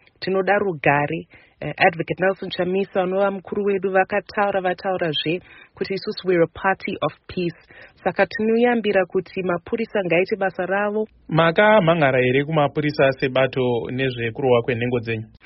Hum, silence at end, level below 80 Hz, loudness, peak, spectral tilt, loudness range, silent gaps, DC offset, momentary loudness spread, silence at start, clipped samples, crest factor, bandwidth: none; 0.2 s; -56 dBFS; -21 LUFS; -2 dBFS; -4 dB/octave; 5 LU; none; under 0.1%; 9 LU; 0.2 s; under 0.1%; 18 dB; 5.8 kHz